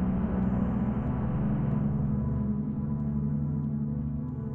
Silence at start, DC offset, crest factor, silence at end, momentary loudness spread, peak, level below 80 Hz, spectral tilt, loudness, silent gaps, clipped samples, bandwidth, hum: 0 s; under 0.1%; 12 dB; 0 s; 3 LU; -18 dBFS; -40 dBFS; -12.5 dB/octave; -30 LUFS; none; under 0.1%; 3.2 kHz; none